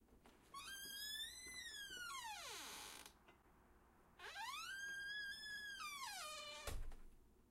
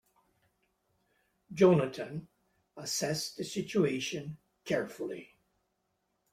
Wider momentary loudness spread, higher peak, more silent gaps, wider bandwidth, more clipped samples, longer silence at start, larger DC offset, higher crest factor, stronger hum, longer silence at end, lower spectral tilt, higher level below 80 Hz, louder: second, 12 LU vs 20 LU; second, -36 dBFS vs -10 dBFS; neither; about the same, 16 kHz vs 16 kHz; neither; second, 0 s vs 1.5 s; neither; second, 18 dB vs 24 dB; neither; second, 0 s vs 1.1 s; second, -0.5 dB/octave vs -5 dB/octave; first, -62 dBFS vs -72 dBFS; second, -50 LUFS vs -32 LUFS